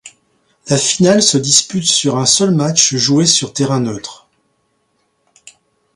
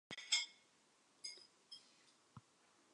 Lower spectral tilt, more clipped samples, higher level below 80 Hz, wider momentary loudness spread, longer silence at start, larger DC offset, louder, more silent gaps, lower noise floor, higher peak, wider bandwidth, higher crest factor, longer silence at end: first, -3.5 dB/octave vs 1 dB/octave; neither; first, -54 dBFS vs under -90 dBFS; second, 8 LU vs 27 LU; about the same, 0.05 s vs 0.1 s; neither; first, -12 LUFS vs -42 LUFS; neither; second, -63 dBFS vs -74 dBFS; first, 0 dBFS vs -24 dBFS; first, 16 kHz vs 11 kHz; second, 16 dB vs 28 dB; first, 1.8 s vs 0.55 s